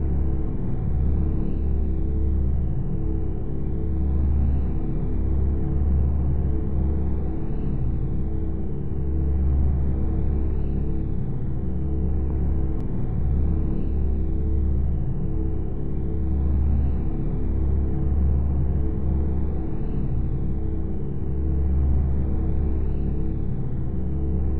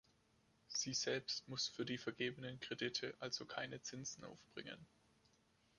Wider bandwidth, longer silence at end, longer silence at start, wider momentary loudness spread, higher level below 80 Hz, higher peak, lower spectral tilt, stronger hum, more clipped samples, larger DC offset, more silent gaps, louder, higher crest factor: second, 2.5 kHz vs 11 kHz; second, 0 s vs 0.9 s; second, 0 s vs 0.7 s; second, 5 LU vs 13 LU; first, -24 dBFS vs -80 dBFS; first, -10 dBFS vs -26 dBFS; first, -12.5 dB/octave vs -2.5 dB/octave; neither; neither; first, 5% vs under 0.1%; neither; first, -26 LUFS vs -45 LUFS; second, 10 dB vs 20 dB